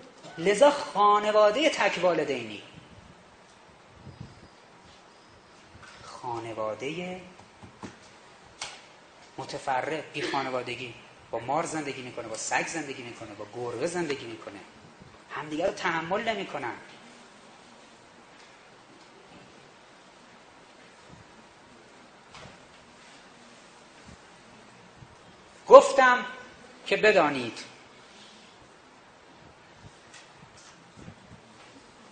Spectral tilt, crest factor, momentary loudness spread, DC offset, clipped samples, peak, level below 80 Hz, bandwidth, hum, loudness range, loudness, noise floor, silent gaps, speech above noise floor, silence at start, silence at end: -3.5 dB/octave; 30 dB; 28 LU; under 0.1%; under 0.1%; 0 dBFS; -68 dBFS; 9.4 kHz; none; 27 LU; -26 LUFS; -54 dBFS; none; 26 dB; 0 s; 0.75 s